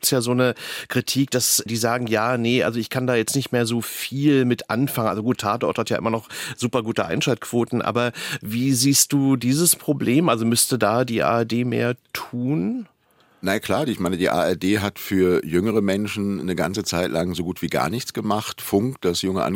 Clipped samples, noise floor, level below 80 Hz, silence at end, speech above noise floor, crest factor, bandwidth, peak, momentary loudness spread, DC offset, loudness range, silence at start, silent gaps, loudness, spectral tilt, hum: under 0.1%; -58 dBFS; -60 dBFS; 0 s; 37 dB; 18 dB; 17 kHz; -4 dBFS; 7 LU; under 0.1%; 5 LU; 0.05 s; none; -21 LUFS; -4.5 dB/octave; none